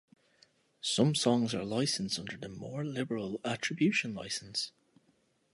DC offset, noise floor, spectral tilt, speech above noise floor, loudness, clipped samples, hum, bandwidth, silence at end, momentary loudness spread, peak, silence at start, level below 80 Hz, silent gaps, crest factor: under 0.1%; -72 dBFS; -4.5 dB/octave; 39 dB; -33 LUFS; under 0.1%; none; 11.5 kHz; 0.85 s; 11 LU; -14 dBFS; 0.85 s; -70 dBFS; none; 20 dB